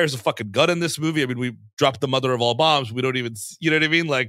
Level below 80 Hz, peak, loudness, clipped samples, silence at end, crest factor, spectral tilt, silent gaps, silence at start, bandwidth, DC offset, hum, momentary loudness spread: -66 dBFS; -2 dBFS; -21 LUFS; under 0.1%; 0 s; 18 dB; -4.5 dB/octave; 1.73-1.77 s; 0 s; 16 kHz; under 0.1%; none; 8 LU